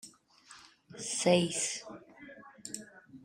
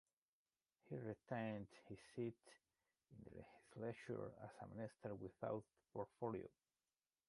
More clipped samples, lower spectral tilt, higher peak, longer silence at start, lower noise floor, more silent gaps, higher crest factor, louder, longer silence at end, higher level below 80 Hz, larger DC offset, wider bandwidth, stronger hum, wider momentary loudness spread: neither; second, -3.5 dB/octave vs -7.5 dB/octave; first, -12 dBFS vs -32 dBFS; second, 0.05 s vs 0.85 s; second, -58 dBFS vs under -90 dBFS; neither; about the same, 24 dB vs 20 dB; first, -32 LUFS vs -52 LUFS; second, 0.05 s vs 0.8 s; first, -74 dBFS vs -80 dBFS; neither; first, 16 kHz vs 11.5 kHz; neither; first, 26 LU vs 13 LU